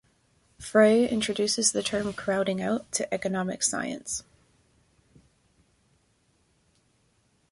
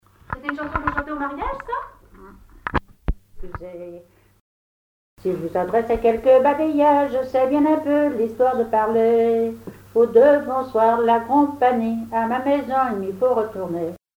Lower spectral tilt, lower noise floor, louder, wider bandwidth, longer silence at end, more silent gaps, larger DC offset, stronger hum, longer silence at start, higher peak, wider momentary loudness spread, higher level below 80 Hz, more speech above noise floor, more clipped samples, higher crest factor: second, -3 dB/octave vs -7.5 dB/octave; first, -68 dBFS vs -45 dBFS; second, -26 LUFS vs -20 LUFS; second, 11.5 kHz vs 16.5 kHz; first, 3.3 s vs 0.2 s; second, none vs 4.41-5.17 s; neither; neither; first, 0.6 s vs 0.3 s; about the same, -6 dBFS vs -4 dBFS; second, 12 LU vs 16 LU; second, -62 dBFS vs -40 dBFS; first, 42 dB vs 26 dB; neither; first, 22 dB vs 16 dB